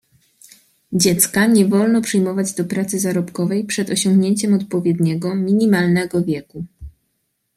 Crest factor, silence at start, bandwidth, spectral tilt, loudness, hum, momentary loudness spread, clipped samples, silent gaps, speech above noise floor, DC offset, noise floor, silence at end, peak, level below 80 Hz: 18 dB; 0.9 s; 15.5 kHz; -5 dB/octave; -17 LUFS; none; 8 LU; under 0.1%; none; 54 dB; under 0.1%; -70 dBFS; 0.7 s; 0 dBFS; -52 dBFS